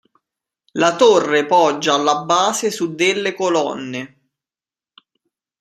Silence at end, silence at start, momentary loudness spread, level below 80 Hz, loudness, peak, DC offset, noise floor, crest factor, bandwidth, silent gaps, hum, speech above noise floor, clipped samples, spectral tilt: 1.55 s; 0.75 s; 14 LU; -68 dBFS; -16 LUFS; -2 dBFS; under 0.1%; under -90 dBFS; 18 dB; 14.5 kHz; none; none; over 74 dB; under 0.1%; -3 dB/octave